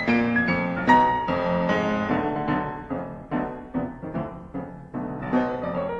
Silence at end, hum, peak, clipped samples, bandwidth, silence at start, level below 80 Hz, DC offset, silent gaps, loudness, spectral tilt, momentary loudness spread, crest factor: 0 s; none; -4 dBFS; under 0.1%; 7.4 kHz; 0 s; -48 dBFS; under 0.1%; none; -25 LUFS; -7.5 dB/octave; 14 LU; 20 dB